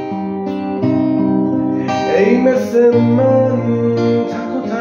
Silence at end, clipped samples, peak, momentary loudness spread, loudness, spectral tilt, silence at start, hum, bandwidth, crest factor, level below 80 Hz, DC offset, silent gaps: 0 s; under 0.1%; 0 dBFS; 9 LU; -15 LUFS; -8 dB/octave; 0 s; none; 7 kHz; 14 dB; -56 dBFS; under 0.1%; none